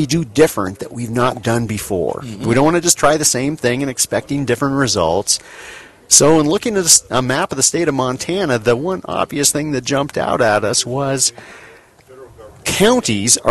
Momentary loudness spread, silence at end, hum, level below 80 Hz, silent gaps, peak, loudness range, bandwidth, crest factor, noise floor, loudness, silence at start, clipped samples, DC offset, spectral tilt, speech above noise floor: 10 LU; 0 s; none; -46 dBFS; none; 0 dBFS; 4 LU; 13 kHz; 16 dB; -43 dBFS; -15 LUFS; 0 s; under 0.1%; under 0.1%; -3 dB/octave; 27 dB